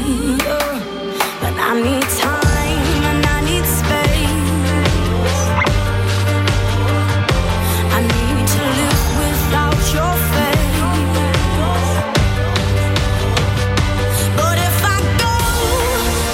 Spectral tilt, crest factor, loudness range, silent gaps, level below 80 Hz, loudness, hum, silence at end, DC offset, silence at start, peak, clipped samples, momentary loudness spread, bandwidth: -4.5 dB/octave; 14 dB; 1 LU; none; -22 dBFS; -16 LUFS; none; 0 s; under 0.1%; 0 s; -2 dBFS; under 0.1%; 2 LU; 16.5 kHz